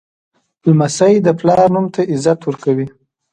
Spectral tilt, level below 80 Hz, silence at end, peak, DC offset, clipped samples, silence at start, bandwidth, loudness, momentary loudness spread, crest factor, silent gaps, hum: -6.5 dB/octave; -54 dBFS; 0.45 s; 0 dBFS; under 0.1%; under 0.1%; 0.65 s; 11 kHz; -14 LUFS; 7 LU; 14 dB; none; none